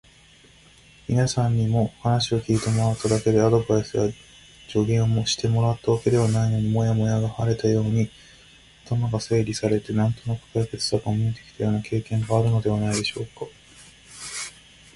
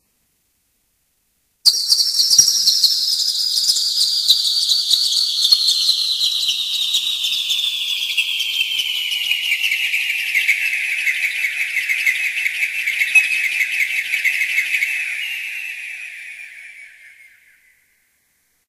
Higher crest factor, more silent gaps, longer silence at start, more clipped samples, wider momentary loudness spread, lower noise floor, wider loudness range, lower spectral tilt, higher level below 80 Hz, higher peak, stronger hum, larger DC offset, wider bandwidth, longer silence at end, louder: about the same, 16 dB vs 20 dB; neither; second, 1.1 s vs 1.65 s; neither; about the same, 10 LU vs 9 LU; second, -53 dBFS vs -66 dBFS; second, 4 LU vs 8 LU; first, -6 dB/octave vs 5 dB/octave; first, -48 dBFS vs -70 dBFS; second, -6 dBFS vs 0 dBFS; neither; neither; second, 11.5 kHz vs 15.5 kHz; second, 0.45 s vs 1.6 s; second, -23 LUFS vs -15 LUFS